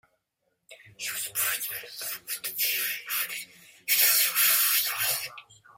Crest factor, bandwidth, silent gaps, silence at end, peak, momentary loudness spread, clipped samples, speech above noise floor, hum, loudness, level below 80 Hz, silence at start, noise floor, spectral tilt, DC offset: 20 dB; 16.5 kHz; none; 0.35 s; -8 dBFS; 16 LU; under 0.1%; 49 dB; none; -25 LUFS; -78 dBFS; 0.7 s; -78 dBFS; 2.5 dB/octave; under 0.1%